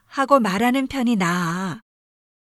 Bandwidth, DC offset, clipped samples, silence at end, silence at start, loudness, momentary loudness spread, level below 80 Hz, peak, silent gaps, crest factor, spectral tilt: 14 kHz; under 0.1%; under 0.1%; 0.75 s; 0.1 s; -20 LUFS; 11 LU; -56 dBFS; -2 dBFS; none; 20 dB; -5.5 dB/octave